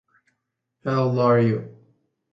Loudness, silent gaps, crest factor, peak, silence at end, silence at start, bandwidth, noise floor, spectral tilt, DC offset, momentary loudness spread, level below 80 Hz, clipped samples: -22 LUFS; none; 16 dB; -8 dBFS; 0.6 s; 0.85 s; 6.2 kHz; -78 dBFS; -9 dB/octave; under 0.1%; 14 LU; -62 dBFS; under 0.1%